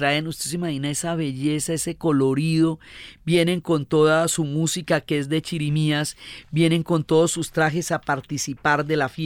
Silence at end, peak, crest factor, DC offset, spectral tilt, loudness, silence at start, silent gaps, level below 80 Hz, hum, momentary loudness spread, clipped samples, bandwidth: 0 s; -6 dBFS; 16 dB; under 0.1%; -5 dB/octave; -22 LUFS; 0 s; none; -54 dBFS; none; 7 LU; under 0.1%; 16 kHz